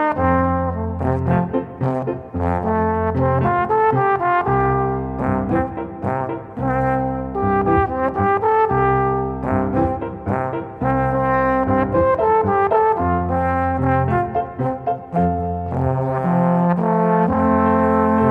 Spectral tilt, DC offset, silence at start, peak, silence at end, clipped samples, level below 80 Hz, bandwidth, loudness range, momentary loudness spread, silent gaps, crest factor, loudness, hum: -10.5 dB/octave; under 0.1%; 0 s; -2 dBFS; 0 s; under 0.1%; -36 dBFS; 4.7 kHz; 3 LU; 7 LU; none; 16 dB; -19 LUFS; none